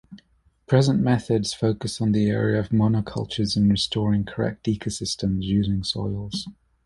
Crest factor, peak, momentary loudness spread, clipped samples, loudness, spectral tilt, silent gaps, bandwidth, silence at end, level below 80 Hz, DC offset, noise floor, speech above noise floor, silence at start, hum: 18 dB; -6 dBFS; 7 LU; under 0.1%; -23 LUFS; -6 dB/octave; none; 11.5 kHz; 0.35 s; -46 dBFS; under 0.1%; -59 dBFS; 37 dB; 0.1 s; none